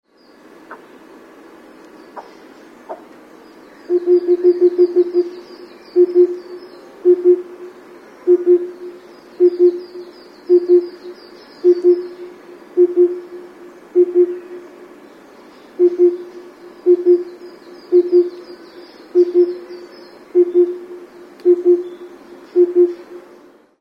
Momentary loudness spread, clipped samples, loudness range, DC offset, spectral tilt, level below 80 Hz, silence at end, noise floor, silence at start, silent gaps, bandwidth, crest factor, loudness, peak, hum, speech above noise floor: 24 LU; under 0.1%; 3 LU; under 0.1%; -6.5 dB/octave; -72 dBFS; 0.6 s; -46 dBFS; 0.7 s; none; 5.4 kHz; 14 dB; -15 LUFS; -2 dBFS; none; 33 dB